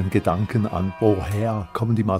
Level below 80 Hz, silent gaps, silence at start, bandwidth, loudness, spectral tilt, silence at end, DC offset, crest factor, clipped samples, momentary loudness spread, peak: -44 dBFS; none; 0 s; 15 kHz; -23 LUFS; -8.5 dB/octave; 0 s; under 0.1%; 18 dB; under 0.1%; 4 LU; -4 dBFS